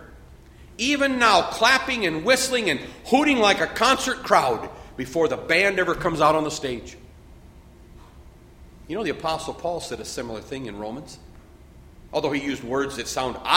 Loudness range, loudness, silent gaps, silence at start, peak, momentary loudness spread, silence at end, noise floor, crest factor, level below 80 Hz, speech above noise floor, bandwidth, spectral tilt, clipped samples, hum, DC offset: 12 LU; -22 LUFS; none; 0 s; 0 dBFS; 15 LU; 0 s; -47 dBFS; 24 dB; -48 dBFS; 25 dB; 16.5 kHz; -3 dB/octave; under 0.1%; none; under 0.1%